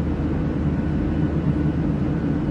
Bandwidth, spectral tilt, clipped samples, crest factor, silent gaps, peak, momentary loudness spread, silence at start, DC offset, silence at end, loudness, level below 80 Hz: 6.4 kHz; -10 dB/octave; under 0.1%; 12 dB; none; -10 dBFS; 2 LU; 0 s; under 0.1%; 0 s; -23 LUFS; -32 dBFS